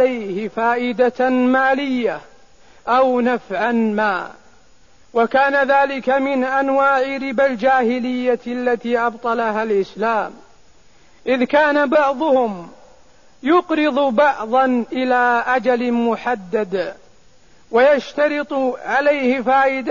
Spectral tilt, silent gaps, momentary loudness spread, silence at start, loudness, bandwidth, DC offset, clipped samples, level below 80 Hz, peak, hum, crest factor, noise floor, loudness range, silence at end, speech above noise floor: -5.5 dB/octave; none; 7 LU; 0 s; -18 LUFS; 7.4 kHz; 0.4%; under 0.1%; -58 dBFS; -4 dBFS; none; 14 dB; -53 dBFS; 3 LU; 0 s; 36 dB